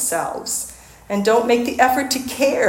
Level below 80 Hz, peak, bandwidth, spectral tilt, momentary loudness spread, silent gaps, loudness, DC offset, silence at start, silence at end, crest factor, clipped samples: -52 dBFS; 0 dBFS; 17 kHz; -3 dB/octave; 9 LU; none; -19 LUFS; under 0.1%; 0 s; 0 s; 18 dB; under 0.1%